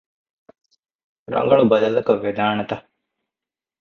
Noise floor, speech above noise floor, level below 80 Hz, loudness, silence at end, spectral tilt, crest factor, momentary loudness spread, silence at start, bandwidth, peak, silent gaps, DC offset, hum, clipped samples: -90 dBFS; 72 dB; -60 dBFS; -19 LUFS; 1 s; -7.5 dB/octave; 20 dB; 12 LU; 1.3 s; 6.6 kHz; -2 dBFS; none; under 0.1%; none; under 0.1%